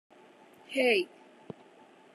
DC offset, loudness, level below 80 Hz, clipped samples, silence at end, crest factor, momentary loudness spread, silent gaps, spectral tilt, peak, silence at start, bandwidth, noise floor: under 0.1%; -29 LUFS; under -90 dBFS; under 0.1%; 1.1 s; 20 dB; 23 LU; none; -3.5 dB/octave; -14 dBFS; 0.7 s; 12.5 kHz; -57 dBFS